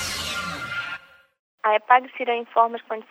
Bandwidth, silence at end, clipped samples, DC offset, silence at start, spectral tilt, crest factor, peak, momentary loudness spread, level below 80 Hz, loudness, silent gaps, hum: 16 kHz; 0.1 s; under 0.1%; under 0.1%; 0 s; -2.5 dB/octave; 22 dB; -2 dBFS; 13 LU; -56 dBFS; -23 LUFS; 1.39-1.58 s; none